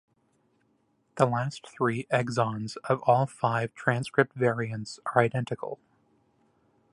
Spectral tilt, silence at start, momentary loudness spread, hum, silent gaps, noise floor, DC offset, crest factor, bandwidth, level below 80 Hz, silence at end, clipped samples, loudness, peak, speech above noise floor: -6.5 dB/octave; 1.15 s; 11 LU; none; none; -70 dBFS; under 0.1%; 24 dB; 11.5 kHz; -68 dBFS; 1.2 s; under 0.1%; -28 LUFS; -6 dBFS; 43 dB